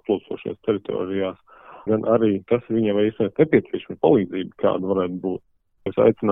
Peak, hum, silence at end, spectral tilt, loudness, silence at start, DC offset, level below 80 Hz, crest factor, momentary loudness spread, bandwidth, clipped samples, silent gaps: -4 dBFS; none; 0 s; -11 dB/octave; -22 LUFS; 0.1 s; under 0.1%; -58 dBFS; 18 dB; 11 LU; 3.8 kHz; under 0.1%; none